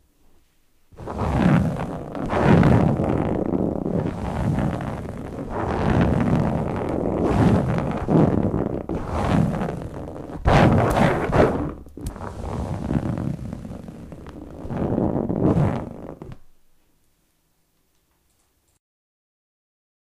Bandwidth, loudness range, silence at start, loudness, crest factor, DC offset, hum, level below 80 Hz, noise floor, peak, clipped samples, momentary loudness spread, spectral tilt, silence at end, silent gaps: 13 kHz; 7 LU; 0.95 s; -22 LUFS; 18 dB; under 0.1%; none; -36 dBFS; -66 dBFS; -6 dBFS; under 0.1%; 18 LU; -8 dB/octave; 3.6 s; none